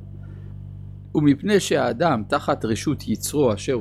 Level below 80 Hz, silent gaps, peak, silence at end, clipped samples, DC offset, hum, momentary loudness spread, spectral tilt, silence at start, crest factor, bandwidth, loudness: -46 dBFS; none; -6 dBFS; 0 s; under 0.1%; under 0.1%; none; 19 LU; -5.5 dB/octave; 0 s; 16 dB; 15.5 kHz; -22 LUFS